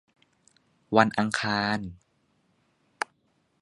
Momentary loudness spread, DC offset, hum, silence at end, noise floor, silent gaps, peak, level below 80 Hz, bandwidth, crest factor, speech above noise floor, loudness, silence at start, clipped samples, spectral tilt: 13 LU; under 0.1%; none; 1.7 s; -70 dBFS; none; -2 dBFS; -62 dBFS; 11.5 kHz; 28 dB; 45 dB; -27 LUFS; 0.9 s; under 0.1%; -5 dB/octave